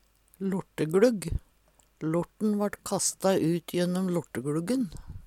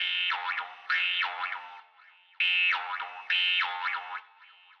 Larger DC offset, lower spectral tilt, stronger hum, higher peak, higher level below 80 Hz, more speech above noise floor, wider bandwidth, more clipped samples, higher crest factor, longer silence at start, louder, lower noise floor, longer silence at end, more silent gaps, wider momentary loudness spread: neither; first, -5.5 dB/octave vs 2.5 dB/octave; neither; first, -8 dBFS vs -16 dBFS; first, -48 dBFS vs under -90 dBFS; first, 36 dB vs 28 dB; first, 16 kHz vs 9.2 kHz; neither; about the same, 20 dB vs 16 dB; first, 0.4 s vs 0 s; about the same, -29 LUFS vs -28 LUFS; first, -64 dBFS vs -59 dBFS; second, 0.05 s vs 0.3 s; neither; second, 11 LU vs 14 LU